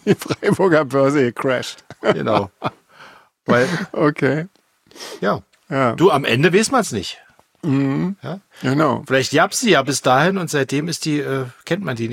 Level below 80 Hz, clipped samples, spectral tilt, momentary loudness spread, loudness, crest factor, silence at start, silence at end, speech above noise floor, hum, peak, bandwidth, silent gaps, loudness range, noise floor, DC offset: -58 dBFS; under 0.1%; -5 dB/octave; 13 LU; -18 LUFS; 18 dB; 0.05 s; 0 s; 28 dB; none; -2 dBFS; 16.5 kHz; none; 3 LU; -45 dBFS; under 0.1%